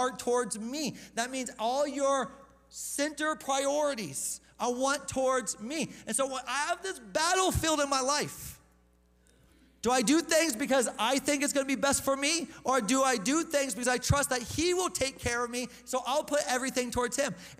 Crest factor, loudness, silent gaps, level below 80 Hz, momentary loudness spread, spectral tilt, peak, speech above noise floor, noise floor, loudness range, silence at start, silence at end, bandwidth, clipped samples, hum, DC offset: 18 dB; -30 LUFS; none; -54 dBFS; 8 LU; -3 dB/octave; -12 dBFS; 35 dB; -65 dBFS; 4 LU; 0 s; 0.05 s; 16 kHz; under 0.1%; none; under 0.1%